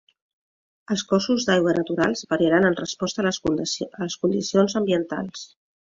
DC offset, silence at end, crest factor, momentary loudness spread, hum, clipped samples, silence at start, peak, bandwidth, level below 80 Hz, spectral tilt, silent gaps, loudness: under 0.1%; 0.5 s; 18 dB; 10 LU; none; under 0.1%; 0.9 s; -6 dBFS; 7.8 kHz; -58 dBFS; -4.5 dB/octave; none; -23 LUFS